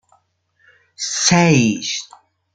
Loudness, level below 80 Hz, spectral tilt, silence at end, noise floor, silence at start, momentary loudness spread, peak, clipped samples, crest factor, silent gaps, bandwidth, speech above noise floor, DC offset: -16 LUFS; -54 dBFS; -4 dB/octave; 0.5 s; -62 dBFS; 1 s; 14 LU; -2 dBFS; under 0.1%; 18 dB; none; 9.4 kHz; 46 dB; under 0.1%